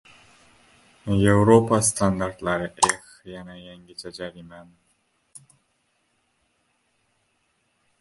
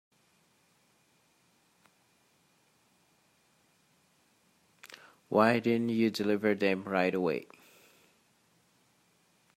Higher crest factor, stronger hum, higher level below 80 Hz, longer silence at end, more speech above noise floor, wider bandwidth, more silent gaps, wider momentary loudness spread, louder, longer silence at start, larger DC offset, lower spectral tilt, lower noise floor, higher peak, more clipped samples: about the same, 22 dB vs 24 dB; neither; first, -48 dBFS vs -80 dBFS; first, 3.4 s vs 2.1 s; first, 48 dB vs 41 dB; second, 12 kHz vs 15.5 kHz; neither; about the same, 25 LU vs 25 LU; first, -21 LUFS vs -29 LUFS; second, 1.05 s vs 4.85 s; neither; second, -5 dB/octave vs -6.5 dB/octave; about the same, -70 dBFS vs -69 dBFS; first, -2 dBFS vs -10 dBFS; neither